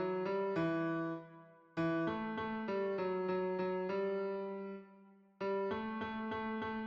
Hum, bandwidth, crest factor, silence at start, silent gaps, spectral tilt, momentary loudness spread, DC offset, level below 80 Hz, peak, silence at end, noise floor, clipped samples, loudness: none; 6.6 kHz; 12 dB; 0 s; none; -8.5 dB/octave; 8 LU; under 0.1%; -72 dBFS; -26 dBFS; 0 s; -62 dBFS; under 0.1%; -39 LUFS